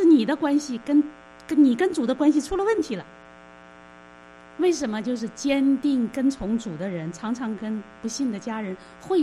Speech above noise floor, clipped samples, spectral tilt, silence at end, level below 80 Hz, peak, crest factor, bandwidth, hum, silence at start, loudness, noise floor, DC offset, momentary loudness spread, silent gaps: 24 dB; under 0.1%; -5.5 dB/octave; 0 s; -54 dBFS; -8 dBFS; 16 dB; 11.5 kHz; 60 Hz at -55 dBFS; 0 s; -24 LUFS; -47 dBFS; under 0.1%; 12 LU; none